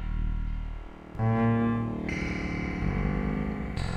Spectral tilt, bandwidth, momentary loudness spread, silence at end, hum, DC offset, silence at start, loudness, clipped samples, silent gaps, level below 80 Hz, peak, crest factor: -8 dB/octave; 9.4 kHz; 12 LU; 0 s; none; under 0.1%; 0 s; -30 LUFS; under 0.1%; none; -34 dBFS; -16 dBFS; 14 dB